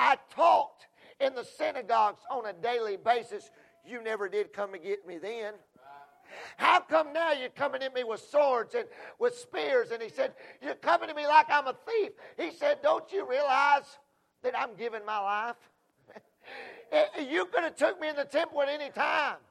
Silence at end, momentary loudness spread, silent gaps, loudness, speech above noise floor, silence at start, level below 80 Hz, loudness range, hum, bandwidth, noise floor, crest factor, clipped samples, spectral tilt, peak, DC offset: 0.1 s; 15 LU; none; -30 LUFS; 28 dB; 0 s; -84 dBFS; 6 LU; none; 12.5 kHz; -58 dBFS; 22 dB; under 0.1%; -3 dB/octave; -8 dBFS; under 0.1%